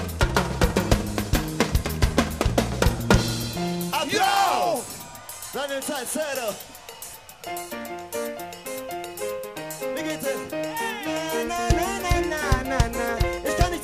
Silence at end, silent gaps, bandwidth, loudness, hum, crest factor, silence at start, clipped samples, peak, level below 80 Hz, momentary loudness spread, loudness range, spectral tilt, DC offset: 0 s; none; 15.5 kHz; -25 LUFS; none; 20 dB; 0 s; under 0.1%; -4 dBFS; -32 dBFS; 13 LU; 9 LU; -4.5 dB/octave; under 0.1%